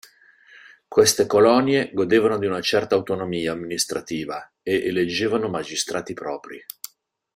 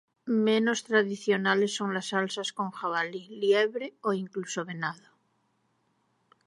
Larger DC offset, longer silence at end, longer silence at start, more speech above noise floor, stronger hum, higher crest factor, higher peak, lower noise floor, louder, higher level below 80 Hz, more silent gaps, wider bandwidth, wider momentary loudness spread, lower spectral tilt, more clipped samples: neither; second, 0.75 s vs 1.5 s; first, 0.9 s vs 0.25 s; second, 31 dB vs 45 dB; neither; about the same, 20 dB vs 20 dB; first, -2 dBFS vs -10 dBFS; second, -53 dBFS vs -73 dBFS; first, -21 LUFS vs -28 LUFS; first, -60 dBFS vs -84 dBFS; neither; first, 16 kHz vs 11.5 kHz; first, 15 LU vs 10 LU; about the same, -3.5 dB/octave vs -4 dB/octave; neither